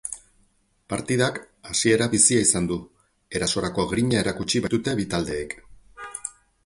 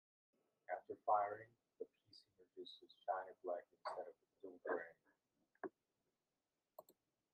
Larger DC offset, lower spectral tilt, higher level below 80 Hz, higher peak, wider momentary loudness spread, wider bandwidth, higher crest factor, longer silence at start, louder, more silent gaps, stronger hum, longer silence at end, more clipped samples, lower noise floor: neither; second, -3.5 dB/octave vs -5 dB/octave; first, -50 dBFS vs under -90 dBFS; first, -4 dBFS vs -26 dBFS; second, 19 LU vs 25 LU; first, 11.5 kHz vs 8.2 kHz; about the same, 22 dB vs 24 dB; second, 0.05 s vs 0.7 s; first, -23 LUFS vs -48 LUFS; neither; neither; about the same, 0.35 s vs 0.4 s; neither; second, -64 dBFS vs under -90 dBFS